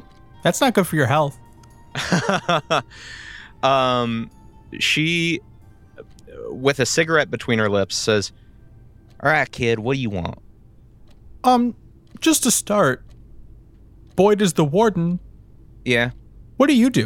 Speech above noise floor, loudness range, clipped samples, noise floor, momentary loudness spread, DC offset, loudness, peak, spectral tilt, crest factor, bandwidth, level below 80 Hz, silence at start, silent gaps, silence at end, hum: 29 dB; 3 LU; under 0.1%; -48 dBFS; 14 LU; under 0.1%; -19 LUFS; -2 dBFS; -4 dB/octave; 20 dB; 17 kHz; -48 dBFS; 0.45 s; none; 0 s; none